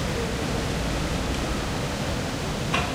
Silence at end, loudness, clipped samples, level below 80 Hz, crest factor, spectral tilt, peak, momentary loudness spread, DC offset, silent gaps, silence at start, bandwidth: 0 s; -27 LUFS; under 0.1%; -34 dBFS; 16 dB; -4.5 dB/octave; -10 dBFS; 2 LU; under 0.1%; none; 0 s; 16 kHz